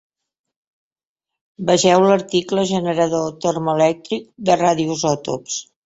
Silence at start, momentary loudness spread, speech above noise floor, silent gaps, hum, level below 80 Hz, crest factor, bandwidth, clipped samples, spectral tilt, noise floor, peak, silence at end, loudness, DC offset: 1.6 s; 11 LU; 68 dB; none; none; -58 dBFS; 18 dB; 8 kHz; under 0.1%; -4.5 dB/octave; -86 dBFS; 0 dBFS; 0.25 s; -18 LUFS; under 0.1%